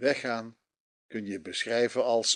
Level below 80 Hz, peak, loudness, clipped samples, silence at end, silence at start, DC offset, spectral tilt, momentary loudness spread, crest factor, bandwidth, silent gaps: -74 dBFS; -12 dBFS; -30 LUFS; under 0.1%; 0 s; 0 s; under 0.1%; -2 dB/octave; 13 LU; 18 dB; 10 kHz; 0.80-1.09 s